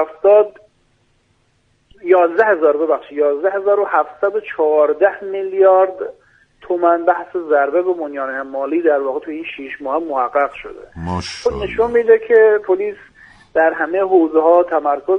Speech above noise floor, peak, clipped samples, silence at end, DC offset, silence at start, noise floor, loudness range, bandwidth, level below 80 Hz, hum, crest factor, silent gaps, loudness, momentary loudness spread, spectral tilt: 45 dB; 0 dBFS; under 0.1%; 0 s; under 0.1%; 0 s; -60 dBFS; 5 LU; 9.4 kHz; -48 dBFS; none; 16 dB; none; -16 LUFS; 12 LU; -6.5 dB/octave